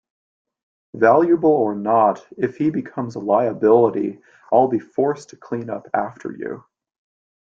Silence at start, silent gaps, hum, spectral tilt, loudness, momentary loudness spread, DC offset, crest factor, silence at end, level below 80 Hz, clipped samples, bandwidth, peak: 0.95 s; none; none; -8.5 dB/octave; -19 LUFS; 15 LU; under 0.1%; 18 dB; 0.9 s; -64 dBFS; under 0.1%; 7.6 kHz; -2 dBFS